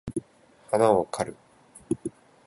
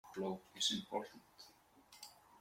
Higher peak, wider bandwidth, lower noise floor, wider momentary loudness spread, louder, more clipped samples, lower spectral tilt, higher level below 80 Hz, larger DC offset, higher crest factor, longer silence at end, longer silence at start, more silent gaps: first, -6 dBFS vs -24 dBFS; second, 11.5 kHz vs 16.5 kHz; second, -56 dBFS vs -66 dBFS; second, 15 LU vs 23 LU; first, -27 LUFS vs -41 LUFS; neither; first, -6 dB/octave vs -2.5 dB/octave; first, -58 dBFS vs -80 dBFS; neither; about the same, 22 dB vs 22 dB; first, 0.35 s vs 0 s; about the same, 0.05 s vs 0.05 s; neither